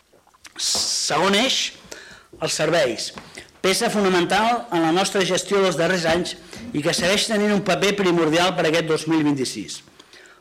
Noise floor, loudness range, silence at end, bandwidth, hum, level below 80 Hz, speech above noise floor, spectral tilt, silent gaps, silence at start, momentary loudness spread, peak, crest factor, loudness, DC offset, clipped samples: -50 dBFS; 2 LU; 0.6 s; 16.5 kHz; none; -56 dBFS; 30 dB; -3.5 dB/octave; none; 0.55 s; 13 LU; -6 dBFS; 14 dB; -20 LUFS; under 0.1%; under 0.1%